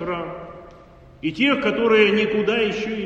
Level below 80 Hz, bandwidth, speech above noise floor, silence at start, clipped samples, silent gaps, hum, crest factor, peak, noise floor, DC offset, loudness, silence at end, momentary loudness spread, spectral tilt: -52 dBFS; 7.8 kHz; 26 dB; 0 s; under 0.1%; none; none; 18 dB; -4 dBFS; -46 dBFS; under 0.1%; -19 LUFS; 0 s; 17 LU; -5.5 dB/octave